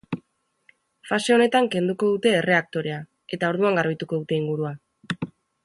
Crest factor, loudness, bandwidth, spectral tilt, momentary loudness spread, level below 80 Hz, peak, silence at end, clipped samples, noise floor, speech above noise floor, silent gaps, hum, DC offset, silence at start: 18 dB; -23 LUFS; 11.5 kHz; -5.5 dB/octave; 16 LU; -66 dBFS; -6 dBFS; 0.4 s; under 0.1%; -67 dBFS; 45 dB; none; none; under 0.1%; 0.1 s